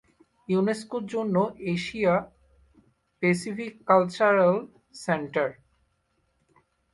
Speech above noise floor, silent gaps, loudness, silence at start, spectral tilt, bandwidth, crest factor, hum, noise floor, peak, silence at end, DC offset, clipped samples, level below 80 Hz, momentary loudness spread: 47 dB; none; -26 LUFS; 0.5 s; -6.5 dB/octave; 11.5 kHz; 20 dB; none; -72 dBFS; -6 dBFS; 1.4 s; under 0.1%; under 0.1%; -64 dBFS; 11 LU